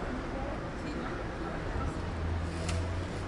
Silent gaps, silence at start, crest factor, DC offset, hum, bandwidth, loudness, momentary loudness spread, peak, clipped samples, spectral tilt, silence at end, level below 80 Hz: none; 0 s; 14 dB; under 0.1%; none; 11.5 kHz; -36 LUFS; 3 LU; -22 dBFS; under 0.1%; -6 dB/octave; 0 s; -42 dBFS